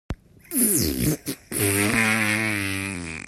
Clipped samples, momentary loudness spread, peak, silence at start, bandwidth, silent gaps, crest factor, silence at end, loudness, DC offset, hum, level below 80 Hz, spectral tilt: under 0.1%; 10 LU; -8 dBFS; 0.1 s; 16 kHz; none; 18 dB; 0.05 s; -22 LUFS; under 0.1%; none; -44 dBFS; -3.5 dB/octave